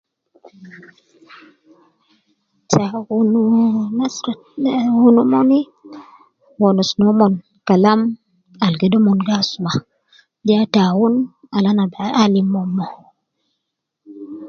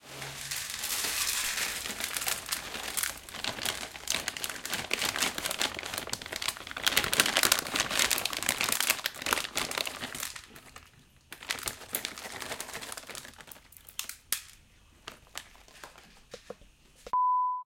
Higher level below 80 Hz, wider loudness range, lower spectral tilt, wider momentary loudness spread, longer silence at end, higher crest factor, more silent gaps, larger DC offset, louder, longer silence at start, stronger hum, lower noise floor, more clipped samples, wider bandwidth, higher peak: about the same, -60 dBFS vs -60 dBFS; second, 4 LU vs 13 LU; first, -6.5 dB/octave vs 0 dB/octave; second, 11 LU vs 22 LU; about the same, 0 s vs 0 s; second, 18 dB vs 30 dB; neither; neither; first, -16 LUFS vs -30 LUFS; first, 0.6 s vs 0.05 s; neither; first, -77 dBFS vs -59 dBFS; neither; second, 7.2 kHz vs 17 kHz; first, 0 dBFS vs -4 dBFS